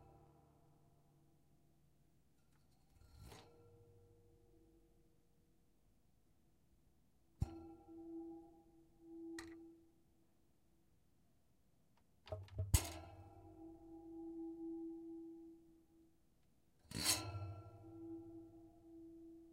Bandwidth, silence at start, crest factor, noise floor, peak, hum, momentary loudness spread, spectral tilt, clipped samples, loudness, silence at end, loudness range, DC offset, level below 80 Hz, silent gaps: 15 kHz; 0 s; 34 dB; -78 dBFS; -18 dBFS; none; 25 LU; -3.5 dB/octave; under 0.1%; -46 LUFS; 0 s; 21 LU; under 0.1%; -60 dBFS; none